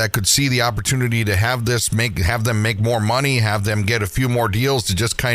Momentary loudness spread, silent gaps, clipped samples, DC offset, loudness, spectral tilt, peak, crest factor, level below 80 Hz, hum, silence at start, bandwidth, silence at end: 4 LU; none; under 0.1%; under 0.1%; -18 LUFS; -4 dB/octave; 0 dBFS; 18 dB; -36 dBFS; none; 0 s; 16 kHz; 0 s